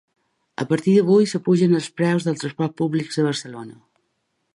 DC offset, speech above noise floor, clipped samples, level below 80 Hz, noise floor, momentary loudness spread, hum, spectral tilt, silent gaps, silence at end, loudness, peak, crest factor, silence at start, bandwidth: under 0.1%; 53 dB; under 0.1%; -68 dBFS; -72 dBFS; 17 LU; none; -6.5 dB/octave; none; 0.85 s; -20 LUFS; -6 dBFS; 16 dB; 0.6 s; 11 kHz